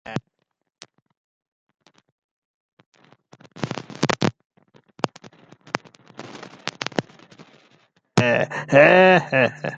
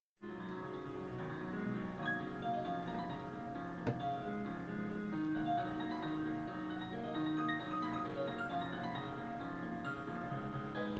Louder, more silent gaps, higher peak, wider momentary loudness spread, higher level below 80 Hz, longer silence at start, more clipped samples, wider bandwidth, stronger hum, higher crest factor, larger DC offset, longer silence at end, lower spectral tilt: first, -19 LUFS vs -41 LUFS; first, 1.17-1.41 s, 1.48-1.67 s, 2.12-2.77 s, 2.86-2.92 s, 4.45-4.50 s vs none; first, 0 dBFS vs -24 dBFS; first, 20 LU vs 7 LU; about the same, -64 dBFS vs -66 dBFS; about the same, 0.1 s vs 0.2 s; neither; first, 9.2 kHz vs 7.8 kHz; neither; first, 22 dB vs 16 dB; neither; about the same, 0 s vs 0 s; second, -5.5 dB/octave vs -7.5 dB/octave